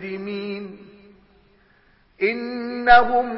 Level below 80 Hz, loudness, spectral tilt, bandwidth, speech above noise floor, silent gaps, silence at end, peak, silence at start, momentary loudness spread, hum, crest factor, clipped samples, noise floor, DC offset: -48 dBFS; -20 LUFS; -9 dB/octave; 5.8 kHz; 39 dB; none; 0 s; -4 dBFS; 0 s; 18 LU; none; 18 dB; under 0.1%; -58 dBFS; under 0.1%